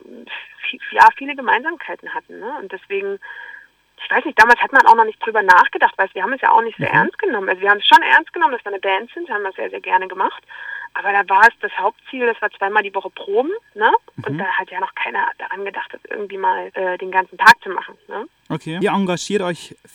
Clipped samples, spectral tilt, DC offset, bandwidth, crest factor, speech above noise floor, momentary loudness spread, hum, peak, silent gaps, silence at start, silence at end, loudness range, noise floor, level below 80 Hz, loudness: under 0.1%; -4 dB/octave; under 0.1%; 16.5 kHz; 18 dB; 25 dB; 19 LU; none; 0 dBFS; none; 0.1 s; 0.25 s; 7 LU; -43 dBFS; -62 dBFS; -16 LUFS